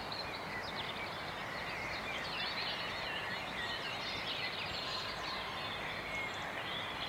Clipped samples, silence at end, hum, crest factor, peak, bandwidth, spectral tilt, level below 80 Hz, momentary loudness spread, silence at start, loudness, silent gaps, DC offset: under 0.1%; 0 s; none; 14 dB; -26 dBFS; 16 kHz; -3 dB/octave; -62 dBFS; 3 LU; 0 s; -39 LUFS; none; under 0.1%